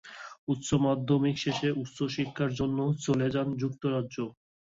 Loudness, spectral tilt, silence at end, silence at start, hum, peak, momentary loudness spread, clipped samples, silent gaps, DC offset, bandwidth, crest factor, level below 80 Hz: -30 LUFS; -6 dB/octave; 0.4 s; 0.05 s; none; -14 dBFS; 9 LU; under 0.1%; 0.38-0.47 s; under 0.1%; 8 kHz; 16 dB; -58 dBFS